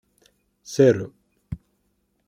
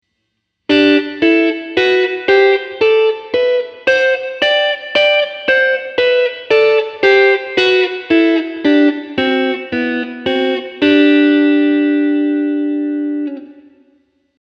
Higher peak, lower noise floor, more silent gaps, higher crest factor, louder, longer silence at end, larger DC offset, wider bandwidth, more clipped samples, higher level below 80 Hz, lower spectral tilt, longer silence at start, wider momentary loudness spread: second, -4 dBFS vs 0 dBFS; about the same, -70 dBFS vs -70 dBFS; neither; first, 20 dB vs 14 dB; second, -20 LUFS vs -13 LUFS; second, 0.75 s vs 0.9 s; neither; first, 14.5 kHz vs 6.8 kHz; neither; first, -52 dBFS vs -60 dBFS; first, -6.5 dB/octave vs -4.5 dB/octave; about the same, 0.7 s vs 0.7 s; first, 20 LU vs 8 LU